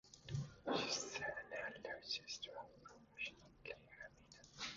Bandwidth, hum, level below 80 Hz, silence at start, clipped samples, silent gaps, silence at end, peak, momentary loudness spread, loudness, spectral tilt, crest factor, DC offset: 7.4 kHz; none; -72 dBFS; 0.05 s; under 0.1%; none; 0 s; -26 dBFS; 17 LU; -46 LUFS; -2.5 dB/octave; 22 dB; under 0.1%